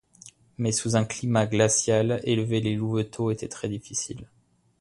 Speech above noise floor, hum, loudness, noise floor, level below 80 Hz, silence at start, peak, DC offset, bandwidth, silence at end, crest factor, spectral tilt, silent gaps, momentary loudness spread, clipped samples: 27 dB; none; -26 LUFS; -52 dBFS; -56 dBFS; 0.25 s; -8 dBFS; under 0.1%; 11.5 kHz; 0.55 s; 20 dB; -5 dB/octave; none; 11 LU; under 0.1%